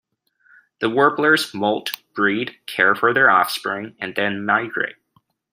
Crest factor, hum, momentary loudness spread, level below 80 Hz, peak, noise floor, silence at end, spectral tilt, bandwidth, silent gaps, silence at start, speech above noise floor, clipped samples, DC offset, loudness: 20 dB; none; 12 LU; -68 dBFS; 0 dBFS; -63 dBFS; 0.6 s; -4 dB/octave; 16 kHz; none; 0.8 s; 44 dB; under 0.1%; under 0.1%; -19 LUFS